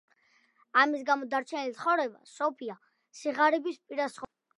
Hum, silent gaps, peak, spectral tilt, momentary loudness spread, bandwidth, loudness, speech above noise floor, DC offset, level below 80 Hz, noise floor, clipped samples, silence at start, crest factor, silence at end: none; none; -10 dBFS; -3 dB/octave; 12 LU; 11.5 kHz; -29 LUFS; 38 dB; under 0.1%; -80 dBFS; -68 dBFS; under 0.1%; 0.75 s; 22 dB; 0.35 s